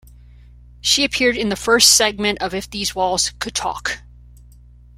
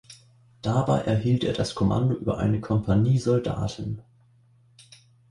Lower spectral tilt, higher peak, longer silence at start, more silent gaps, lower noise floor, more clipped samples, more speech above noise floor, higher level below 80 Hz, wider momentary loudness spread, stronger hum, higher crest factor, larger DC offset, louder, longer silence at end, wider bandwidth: second, -1 dB/octave vs -7.5 dB/octave; first, 0 dBFS vs -8 dBFS; about the same, 0.05 s vs 0.1 s; neither; second, -45 dBFS vs -59 dBFS; neither; second, 26 dB vs 35 dB; about the same, -42 dBFS vs -46 dBFS; first, 13 LU vs 10 LU; first, 60 Hz at -40 dBFS vs none; about the same, 20 dB vs 16 dB; neither; first, -17 LUFS vs -25 LUFS; second, 1 s vs 1.3 s; first, 16.5 kHz vs 11.5 kHz